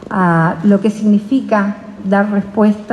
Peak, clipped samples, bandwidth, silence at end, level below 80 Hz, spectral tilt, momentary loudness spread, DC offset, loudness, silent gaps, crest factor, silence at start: 0 dBFS; under 0.1%; 9.6 kHz; 0 s; -54 dBFS; -8.5 dB/octave; 4 LU; under 0.1%; -14 LUFS; none; 12 dB; 0 s